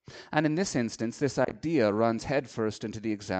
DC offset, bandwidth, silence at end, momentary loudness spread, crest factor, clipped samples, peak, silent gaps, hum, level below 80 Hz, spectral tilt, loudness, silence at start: under 0.1%; 9 kHz; 0 s; 7 LU; 20 dB; under 0.1%; -10 dBFS; none; none; -60 dBFS; -5.5 dB/octave; -29 LUFS; 0.1 s